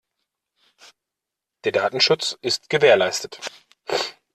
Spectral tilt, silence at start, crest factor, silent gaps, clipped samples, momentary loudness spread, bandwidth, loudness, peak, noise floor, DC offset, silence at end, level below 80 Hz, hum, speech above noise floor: -2.5 dB/octave; 1.65 s; 20 dB; none; under 0.1%; 17 LU; 13.5 kHz; -20 LUFS; -2 dBFS; -85 dBFS; under 0.1%; 0.25 s; -68 dBFS; none; 65 dB